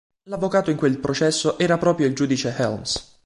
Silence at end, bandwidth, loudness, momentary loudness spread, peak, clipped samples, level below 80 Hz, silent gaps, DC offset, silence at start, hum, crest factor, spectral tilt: 0.25 s; 11.5 kHz; -21 LUFS; 7 LU; -6 dBFS; under 0.1%; -52 dBFS; none; under 0.1%; 0.25 s; none; 16 dB; -5 dB/octave